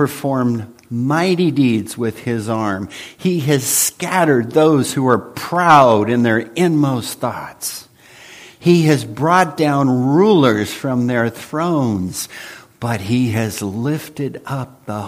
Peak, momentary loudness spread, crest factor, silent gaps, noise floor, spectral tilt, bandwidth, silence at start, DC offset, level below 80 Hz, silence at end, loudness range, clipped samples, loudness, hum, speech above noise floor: 0 dBFS; 13 LU; 16 dB; none; -42 dBFS; -5.5 dB/octave; 15.5 kHz; 0 s; under 0.1%; -56 dBFS; 0 s; 6 LU; under 0.1%; -16 LUFS; none; 26 dB